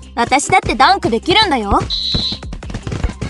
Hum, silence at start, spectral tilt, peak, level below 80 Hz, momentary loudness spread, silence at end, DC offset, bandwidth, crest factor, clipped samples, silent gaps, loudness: none; 0 s; -3.5 dB/octave; 0 dBFS; -28 dBFS; 14 LU; 0 s; under 0.1%; 12 kHz; 14 dB; under 0.1%; none; -14 LUFS